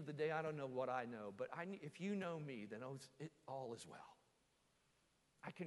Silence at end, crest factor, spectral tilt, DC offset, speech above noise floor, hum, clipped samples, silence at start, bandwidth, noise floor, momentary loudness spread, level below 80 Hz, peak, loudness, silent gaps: 0 s; 18 dB; -6 dB/octave; under 0.1%; 33 dB; none; under 0.1%; 0 s; 11.5 kHz; -80 dBFS; 13 LU; -88 dBFS; -30 dBFS; -48 LUFS; none